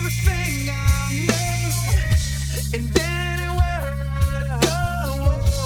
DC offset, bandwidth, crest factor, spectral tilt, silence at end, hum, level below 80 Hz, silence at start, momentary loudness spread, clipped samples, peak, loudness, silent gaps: under 0.1%; 19.5 kHz; 18 dB; -4.5 dB/octave; 0 s; none; -24 dBFS; 0 s; 4 LU; under 0.1%; -2 dBFS; -22 LUFS; none